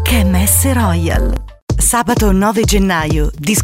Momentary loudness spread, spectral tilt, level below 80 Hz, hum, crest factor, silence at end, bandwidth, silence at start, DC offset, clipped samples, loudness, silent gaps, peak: 6 LU; -4.5 dB/octave; -18 dBFS; none; 10 dB; 0 s; 16.5 kHz; 0 s; under 0.1%; under 0.1%; -13 LUFS; 1.62-1.68 s; -2 dBFS